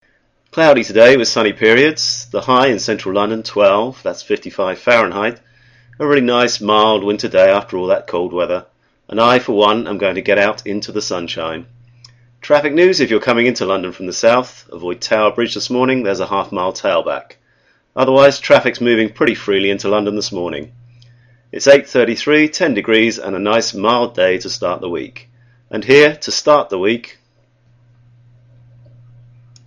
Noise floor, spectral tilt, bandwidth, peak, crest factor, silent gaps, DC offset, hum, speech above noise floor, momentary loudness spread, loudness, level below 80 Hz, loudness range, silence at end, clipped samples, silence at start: -58 dBFS; -4 dB/octave; 10 kHz; 0 dBFS; 16 dB; none; under 0.1%; none; 44 dB; 12 LU; -14 LUFS; -54 dBFS; 3 LU; 2.6 s; under 0.1%; 0.55 s